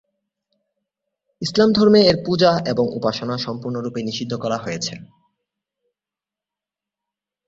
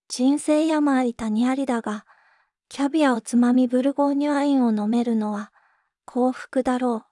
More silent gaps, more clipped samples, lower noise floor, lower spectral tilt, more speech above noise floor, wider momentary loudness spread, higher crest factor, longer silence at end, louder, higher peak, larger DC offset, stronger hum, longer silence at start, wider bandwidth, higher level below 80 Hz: neither; neither; first, -89 dBFS vs -65 dBFS; about the same, -5.5 dB/octave vs -5 dB/octave; first, 70 dB vs 44 dB; first, 13 LU vs 9 LU; about the same, 20 dB vs 16 dB; first, 2.45 s vs 0.1 s; first, -19 LUFS vs -22 LUFS; first, -2 dBFS vs -6 dBFS; neither; neither; first, 1.4 s vs 0.1 s; second, 7.8 kHz vs 11.5 kHz; first, -56 dBFS vs -62 dBFS